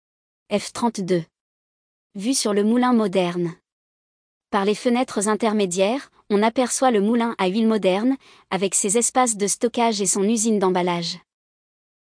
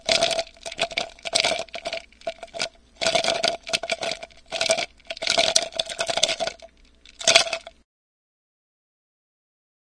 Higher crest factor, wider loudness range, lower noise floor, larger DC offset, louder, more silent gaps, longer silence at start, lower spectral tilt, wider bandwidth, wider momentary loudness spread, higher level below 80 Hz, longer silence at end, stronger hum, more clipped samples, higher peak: second, 16 dB vs 26 dB; about the same, 3 LU vs 3 LU; first, under -90 dBFS vs -52 dBFS; neither; about the same, -21 LUFS vs -23 LUFS; first, 1.41-2.10 s, 3.72-4.41 s vs none; first, 0.5 s vs 0.05 s; first, -4 dB/octave vs 0 dB/octave; about the same, 10.5 kHz vs 11 kHz; second, 8 LU vs 14 LU; second, -68 dBFS vs -58 dBFS; second, 0.85 s vs 2.3 s; neither; neither; second, -6 dBFS vs 0 dBFS